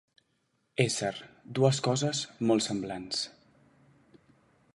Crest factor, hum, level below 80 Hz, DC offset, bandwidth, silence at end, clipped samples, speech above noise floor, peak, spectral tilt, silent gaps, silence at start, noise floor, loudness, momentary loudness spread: 24 dB; none; -68 dBFS; under 0.1%; 11.5 kHz; 1.45 s; under 0.1%; 46 dB; -8 dBFS; -4.5 dB/octave; none; 0.8 s; -75 dBFS; -30 LUFS; 12 LU